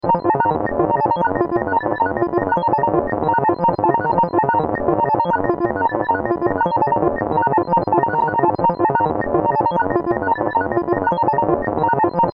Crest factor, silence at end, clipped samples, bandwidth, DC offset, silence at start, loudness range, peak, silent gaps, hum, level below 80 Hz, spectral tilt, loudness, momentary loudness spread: 16 dB; 0.05 s; under 0.1%; 5.2 kHz; under 0.1%; 0.05 s; 1 LU; -2 dBFS; none; none; -46 dBFS; -10.5 dB/octave; -18 LUFS; 3 LU